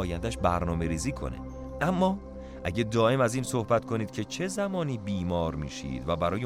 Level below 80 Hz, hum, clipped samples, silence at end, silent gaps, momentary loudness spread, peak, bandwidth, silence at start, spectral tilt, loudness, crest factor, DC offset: -44 dBFS; none; under 0.1%; 0 s; none; 11 LU; -12 dBFS; 16 kHz; 0 s; -6 dB/octave; -29 LUFS; 16 dB; under 0.1%